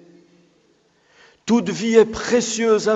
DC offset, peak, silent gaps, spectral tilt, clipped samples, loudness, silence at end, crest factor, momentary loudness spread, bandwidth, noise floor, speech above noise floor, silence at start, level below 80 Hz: under 0.1%; 0 dBFS; none; -4 dB/octave; under 0.1%; -18 LUFS; 0 s; 20 dB; 5 LU; 8.2 kHz; -60 dBFS; 43 dB; 1.45 s; -54 dBFS